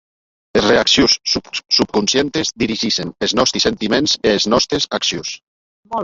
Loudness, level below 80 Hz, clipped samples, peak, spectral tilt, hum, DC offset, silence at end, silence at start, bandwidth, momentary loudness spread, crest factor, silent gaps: -15 LUFS; -44 dBFS; under 0.1%; -2 dBFS; -3 dB/octave; none; under 0.1%; 0 s; 0.55 s; 8 kHz; 8 LU; 16 dB; 5.43-5.83 s